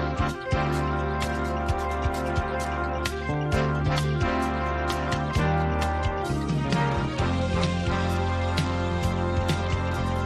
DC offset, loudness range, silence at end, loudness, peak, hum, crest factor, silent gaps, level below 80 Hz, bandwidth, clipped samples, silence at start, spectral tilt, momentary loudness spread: under 0.1%; 1 LU; 0 s; -26 LUFS; -10 dBFS; none; 16 dB; none; -34 dBFS; 14 kHz; under 0.1%; 0 s; -6 dB/octave; 3 LU